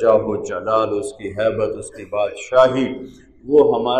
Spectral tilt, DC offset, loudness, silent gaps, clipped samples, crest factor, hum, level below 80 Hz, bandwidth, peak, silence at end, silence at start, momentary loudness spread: -5.5 dB/octave; under 0.1%; -19 LUFS; none; under 0.1%; 16 dB; none; -52 dBFS; 10.5 kHz; -2 dBFS; 0 s; 0 s; 15 LU